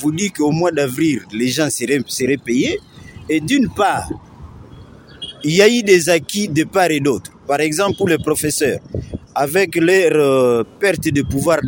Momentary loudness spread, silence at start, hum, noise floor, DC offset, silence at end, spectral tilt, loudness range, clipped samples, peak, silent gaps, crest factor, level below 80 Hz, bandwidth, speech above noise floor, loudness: 12 LU; 0 s; none; -39 dBFS; under 0.1%; 0 s; -4.5 dB/octave; 4 LU; under 0.1%; 0 dBFS; none; 16 dB; -44 dBFS; 17 kHz; 24 dB; -16 LUFS